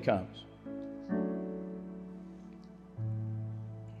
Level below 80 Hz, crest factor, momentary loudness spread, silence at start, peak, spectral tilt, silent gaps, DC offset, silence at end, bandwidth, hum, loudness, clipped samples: -66 dBFS; 22 dB; 15 LU; 0 s; -16 dBFS; -9 dB/octave; none; under 0.1%; 0 s; 7 kHz; none; -40 LUFS; under 0.1%